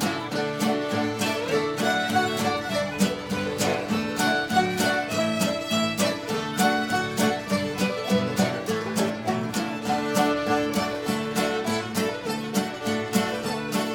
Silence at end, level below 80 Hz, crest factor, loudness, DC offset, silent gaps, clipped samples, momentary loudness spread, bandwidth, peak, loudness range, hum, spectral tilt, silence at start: 0 s; -58 dBFS; 16 dB; -25 LUFS; under 0.1%; none; under 0.1%; 5 LU; 19 kHz; -8 dBFS; 2 LU; none; -4 dB/octave; 0 s